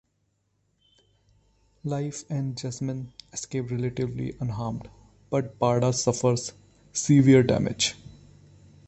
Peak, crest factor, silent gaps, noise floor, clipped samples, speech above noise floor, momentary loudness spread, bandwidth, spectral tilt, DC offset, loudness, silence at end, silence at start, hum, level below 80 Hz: -6 dBFS; 20 dB; none; -73 dBFS; under 0.1%; 48 dB; 17 LU; 8.6 kHz; -5.5 dB/octave; under 0.1%; -26 LUFS; 0.8 s; 1.85 s; 50 Hz at -55 dBFS; -54 dBFS